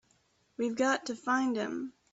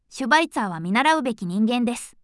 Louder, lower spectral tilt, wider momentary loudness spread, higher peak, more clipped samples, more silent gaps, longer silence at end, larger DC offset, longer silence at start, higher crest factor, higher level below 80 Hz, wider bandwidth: second, -32 LUFS vs -21 LUFS; about the same, -3.5 dB/octave vs -4.5 dB/octave; about the same, 9 LU vs 7 LU; second, -16 dBFS vs -2 dBFS; neither; neither; about the same, 0.25 s vs 0.15 s; neither; first, 0.6 s vs 0.1 s; about the same, 16 dB vs 20 dB; second, -76 dBFS vs -62 dBFS; second, 8 kHz vs 12 kHz